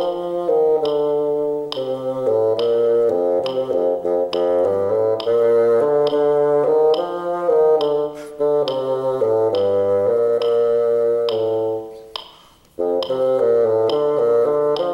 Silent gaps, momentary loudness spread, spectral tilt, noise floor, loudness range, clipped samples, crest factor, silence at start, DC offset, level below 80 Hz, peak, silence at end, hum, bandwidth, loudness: none; 7 LU; -6.5 dB/octave; -48 dBFS; 3 LU; under 0.1%; 12 dB; 0 s; under 0.1%; -60 dBFS; -6 dBFS; 0 s; none; 6.2 kHz; -18 LUFS